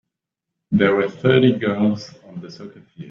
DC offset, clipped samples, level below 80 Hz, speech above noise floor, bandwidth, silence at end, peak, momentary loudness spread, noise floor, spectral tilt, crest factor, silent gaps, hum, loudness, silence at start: under 0.1%; under 0.1%; -56 dBFS; 63 dB; 7 kHz; 0 s; -2 dBFS; 21 LU; -82 dBFS; -7.5 dB/octave; 18 dB; none; none; -18 LUFS; 0.7 s